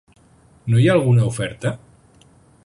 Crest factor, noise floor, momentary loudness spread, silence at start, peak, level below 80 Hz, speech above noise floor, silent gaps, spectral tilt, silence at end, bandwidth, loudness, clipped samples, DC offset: 16 dB; -52 dBFS; 16 LU; 0.65 s; -4 dBFS; -50 dBFS; 36 dB; none; -7 dB/octave; 0.9 s; 11.5 kHz; -18 LUFS; under 0.1%; under 0.1%